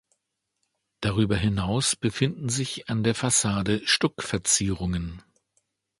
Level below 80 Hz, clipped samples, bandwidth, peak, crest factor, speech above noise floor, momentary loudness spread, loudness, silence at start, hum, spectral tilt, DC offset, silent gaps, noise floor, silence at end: -46 dBFS; under 0.1%; 11.5 kHz; -8 dBFS; 20 dB; 54 dB; 7 LU; -25 LUFS; 1 s; none; -3.5 dB/octave; under 0.1%; none; -80 dBFS; 0.8 s